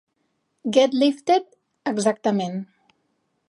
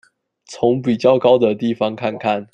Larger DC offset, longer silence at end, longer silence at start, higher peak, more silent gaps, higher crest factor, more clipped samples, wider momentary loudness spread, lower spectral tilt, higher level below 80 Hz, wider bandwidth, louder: neither; first, 0.85 s vs 0.1 s; first, 0.65 s vs 0.5 s; about the same, -4 dBFS vs -2 dBFS; neither; about the same, 20 dB vs 16 dB; neither; first, 14 LU vs 8 LU; second, -5 dB/octave vs -6.5 dB/octave; second, -78 dBFS vs -60 dBFS; first, 11.5 kHz vs 9 kHz; second, -22 LUFS vs -17 LUFS